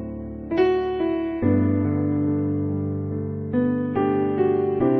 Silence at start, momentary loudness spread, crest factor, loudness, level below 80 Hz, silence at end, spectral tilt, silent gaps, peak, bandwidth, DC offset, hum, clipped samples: 0 s; 7 LU; 14 dB; -23 LUFS; -48 dBFS; 0 s; -11 dB/octave; none; -8 dBFS; 5.8 kHz; under 0.1%; none; under 0.1%